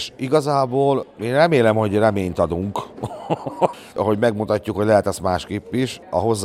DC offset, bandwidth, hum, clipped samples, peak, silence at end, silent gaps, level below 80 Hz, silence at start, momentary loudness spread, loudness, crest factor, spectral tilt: under 0.1%; 15.5 kHz; none; under 0.1%; 0 dBFS; 0 s; none; -50 dBFS; 0 s; 10 LU; -20 LUFS; 20 dB; -6 dB/octave